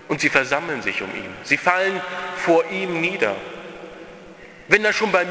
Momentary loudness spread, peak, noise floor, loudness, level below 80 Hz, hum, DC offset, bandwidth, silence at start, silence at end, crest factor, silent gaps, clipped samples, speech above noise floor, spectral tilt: 19 LU; 0 dBFS; -42 dBFS; -20 LUFS; -58 dBFS; none; under 0.1%; 8 kHz; 0 s; 0 s; 22 dB; none; under 0.1%; 21 dB; -4 dB/octave